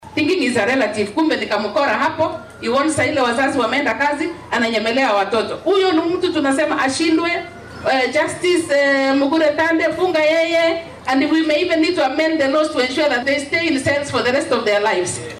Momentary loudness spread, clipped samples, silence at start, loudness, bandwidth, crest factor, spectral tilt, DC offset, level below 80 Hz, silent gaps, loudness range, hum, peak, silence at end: 4 LU; under 0.1%; 0 s; -17 LUFS; 13 kHz; 10 dB; -4 dB/octave; under 0.1%; -54 dBFS; none; 2 LU; none; -6 dBFS; 0 s